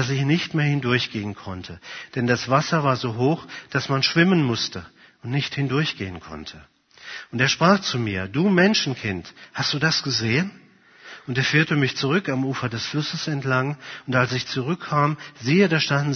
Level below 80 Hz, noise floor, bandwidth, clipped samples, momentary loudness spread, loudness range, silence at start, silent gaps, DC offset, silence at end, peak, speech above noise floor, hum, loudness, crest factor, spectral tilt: -58 dBFS; -47 dBFS; 6.6 kHz; under 0.1%; 16 LU; 3 LU; 0 s; none; under 0.1%; 0 s; -2 dBFS; 25 dB; none; -22 LUFS; 20 dB; -5 dB/octave